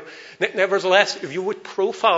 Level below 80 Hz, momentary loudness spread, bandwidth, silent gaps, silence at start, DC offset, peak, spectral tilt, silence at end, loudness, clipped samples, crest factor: -76 dBFS; 10 LU; 8 kHz; none; 0 s; under 0.1%; 0 dBFS; -3 dB/octave; 0 s; -21 LUFS; under 0.1%; 20 dB